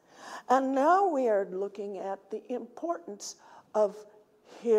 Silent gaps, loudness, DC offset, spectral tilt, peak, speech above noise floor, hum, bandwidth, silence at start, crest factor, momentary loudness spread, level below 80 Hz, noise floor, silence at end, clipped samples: none; -30 LUFS; under 0.1%; -4.5 dB/octave; -10 dBFS; 25 dB; none; 14.5 kHz; 0.2 s; 20 dB; 18 LU; -86 dBFS; -54 dBFS; 0 s; under 0.1%